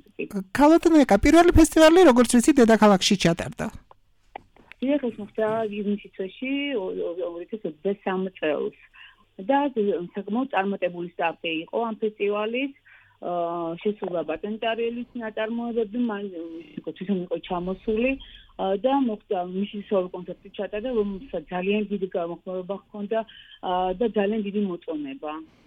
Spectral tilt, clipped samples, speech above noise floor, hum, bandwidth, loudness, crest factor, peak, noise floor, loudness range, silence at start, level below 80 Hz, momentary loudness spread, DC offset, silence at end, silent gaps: -5 dB/octave; under 0.1%; 35 dB; none; 17 kHz; -24 LUFS; 16 dB; -8 dBFS; -58 dBFS; 11 LU; 0.2 s; -44 dBFS; 17 LU; under 0.1%; 0.2 s; none